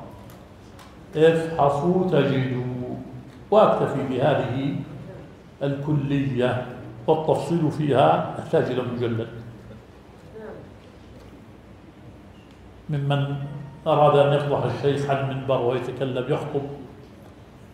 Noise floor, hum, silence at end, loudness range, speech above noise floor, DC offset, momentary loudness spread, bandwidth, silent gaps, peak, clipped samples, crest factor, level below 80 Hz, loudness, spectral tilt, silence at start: -46 dBFS; none; 0.1 s; 11 LU; 24 dB; under 0.1%; 21 LU; 11.5 kHz; none; -4 dBFS; under 0.1%; 20 dB; -54 dBFS; -23 LUFS; -8 dB/octave; 0 s